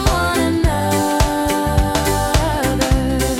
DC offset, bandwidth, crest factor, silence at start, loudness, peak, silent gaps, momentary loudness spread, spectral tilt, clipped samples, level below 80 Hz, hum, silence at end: under 0.1%; 17.5 kHz; 12 dB; 0 s; -17 LUFS; -4 dBFS; none; 1 LU; -5 dB/octave; under 0.1%; -22 dBFS; none; 0 s